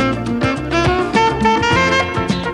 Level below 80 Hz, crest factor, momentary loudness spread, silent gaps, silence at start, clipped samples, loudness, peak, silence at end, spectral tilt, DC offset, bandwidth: -32 dBFS; 12 dB; 5 LU; none; 0 s; under 0.1%; -15 LUFS; -4 dBFS; 0 s; -5 dB/octave; under 0.1%; 12 kHz